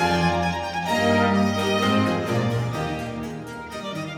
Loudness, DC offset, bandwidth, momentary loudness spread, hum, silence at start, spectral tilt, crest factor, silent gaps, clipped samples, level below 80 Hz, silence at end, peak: -23 LUFS; under 0.1%; 17 kHz; 13 LU; none; 0 s; -5.5 dB/octave; 16 dB; none; under 0.1%; -48 dBFS; 0 s; -8 dBFS